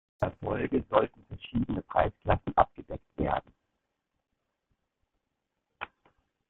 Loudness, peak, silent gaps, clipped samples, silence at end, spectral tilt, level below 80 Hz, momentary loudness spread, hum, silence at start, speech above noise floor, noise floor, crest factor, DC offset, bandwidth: -30 LUFS; -6 dBFS; none; under 0.1%; 0.65 s; -9.5 dB/octave; -48 dBFS; 17 LU; none; 0.2 s; 54 dB; -83 dBFS; 26 dB; under 0.1%; 4.2 kHz